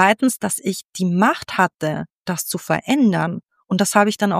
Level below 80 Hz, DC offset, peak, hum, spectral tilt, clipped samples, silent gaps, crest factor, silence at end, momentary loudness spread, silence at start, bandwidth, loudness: -62 dBFS; under 0.1%; -2 dBFS; none; -4.5 dB/octave; under 0.1%; 0.85-0.90 s, 2.15-2.22 s; 18 dB; 0 s; 9 LU; 0 s; 15.5 kHz; -19 LUFS